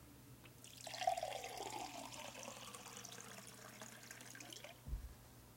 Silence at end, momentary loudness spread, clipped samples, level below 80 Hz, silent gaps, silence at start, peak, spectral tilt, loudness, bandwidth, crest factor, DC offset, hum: 0 s; 16 LU; under 0.1%; -60 dBFS; none; 0 s; -24 dBFS; -2.5 dB/octave; -49 LUFS; 16.5 kHz; 26 dB; under 0.1%; none